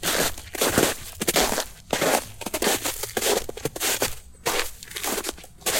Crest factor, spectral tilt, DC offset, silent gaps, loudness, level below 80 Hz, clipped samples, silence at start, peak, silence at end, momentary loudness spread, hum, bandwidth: 20 dB; -2 dB/octave; under 0.1%; none; -25 LUFS; -44 dBFS; under 0.1%; 0 s; -6 dBFS; 0 s; 9 LU; none; 17 kHz